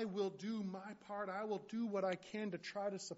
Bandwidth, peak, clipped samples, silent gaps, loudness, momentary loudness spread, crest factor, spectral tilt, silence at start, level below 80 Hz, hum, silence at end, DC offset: 8 kHz; -28 dBFS; under 0.1%; none; -43 LUFS; 6 LU; 16 dB; -5 dB/octave; 0 s; -86 dBFS; none; 0 s; under 0.1%